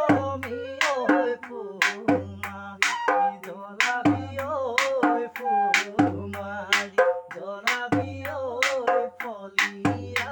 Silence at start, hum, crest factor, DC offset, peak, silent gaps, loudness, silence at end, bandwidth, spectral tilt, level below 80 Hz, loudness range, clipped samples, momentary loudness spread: 0 s; none; 24 dB; under 0.1%; -2 dBFS; none; -25 LUFS; 0 s; 18 kHz; -4 dB/octave; -70 dBFS; 1 LU; under 0.1%; 11 LU